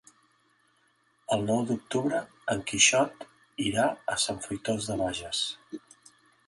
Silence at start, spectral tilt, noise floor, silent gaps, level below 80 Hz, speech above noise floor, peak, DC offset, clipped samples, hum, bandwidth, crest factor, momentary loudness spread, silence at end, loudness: 1.3 s; -2.5 dB/octave; -68 dBFS; none; -60 dBFS; 40 dB; -6 dBFS; under 0.1%; under 0.1%; none; 11.5 kHz; 24 dB; 21 LU; 0.7 s; -28 LUFS